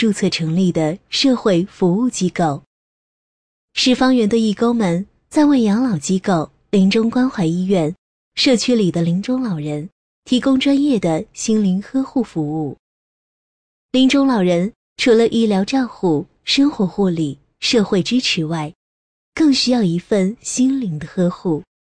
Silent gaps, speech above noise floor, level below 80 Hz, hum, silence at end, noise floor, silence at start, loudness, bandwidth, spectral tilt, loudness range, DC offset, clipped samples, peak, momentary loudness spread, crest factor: 2.67-3.68 s, 7.98-8.32 s, 9.92-10.23 s, 12.79-13.89 s, 14.76-14.96 s, 18.75-19.32 s; over 74 dB; -52 dBFS; none; 0.2 s; under -90 dBFS; 0 s; -17 LUFS; 10.5 kHz; -5.5 dB/octave; 3 LU; under 0.1%; under 0.1%; -4 dBFS; 9 LU; 14 dB